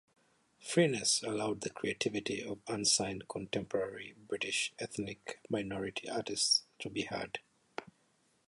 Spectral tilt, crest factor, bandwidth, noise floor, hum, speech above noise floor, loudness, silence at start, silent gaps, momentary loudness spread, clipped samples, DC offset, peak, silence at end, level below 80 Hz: -2.5 dB/octave; 22 dB; 11.5 kHz; -73 dBFS; none; 37 dB; -35 LUFS; 0.6 s; none; 15 LU; under 0.1%; under 0.1%; -14 dBFS; 0.65 s; -70 dBFS